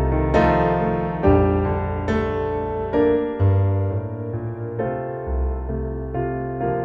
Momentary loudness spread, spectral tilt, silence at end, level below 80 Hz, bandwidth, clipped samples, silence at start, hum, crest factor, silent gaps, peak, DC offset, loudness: 10 LU; -9.5 dB/octave; 0 s; -30 dBFS; 7 kHz; under 0.1%; 0 s; none; 16 dB; none; -4 dBFS; under 0.1%; -22 LUFS